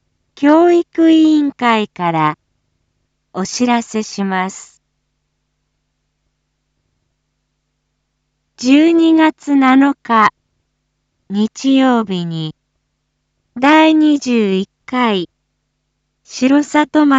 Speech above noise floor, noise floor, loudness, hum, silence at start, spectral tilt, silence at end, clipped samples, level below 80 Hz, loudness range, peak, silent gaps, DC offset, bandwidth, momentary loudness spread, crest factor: 57 dB; -69 dBFS; -13 LUFS; none; 0.4 s; -5 dB/octave; 0 s; under 0.1%; -62 dBFS; 8 LU; 0 dBFS; none; under 0.1%; 8 kHz; 14 LU; 14 dB